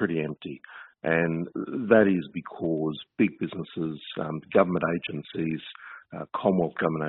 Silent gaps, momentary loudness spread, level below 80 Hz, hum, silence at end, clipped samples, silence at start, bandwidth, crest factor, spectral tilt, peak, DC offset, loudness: none; 17 LU; -64 dBFS; none; 0 s; under 0.1%; 0 s; 4.1 kHz; 22 dB; -5.5 dB/octave; -6 dBFS; under 0.1%; -27 LUFS